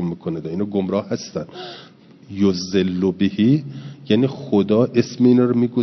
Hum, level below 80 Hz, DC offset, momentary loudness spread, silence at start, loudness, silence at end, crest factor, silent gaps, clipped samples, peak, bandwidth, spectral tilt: none; -62 dBFS; under 0.1%; 18 LU; 0 s; -19 LUFS; 0 s; 16 dB; none; under 0.1%; -2 dBFS; 6.2 kHz; -7 dB/octave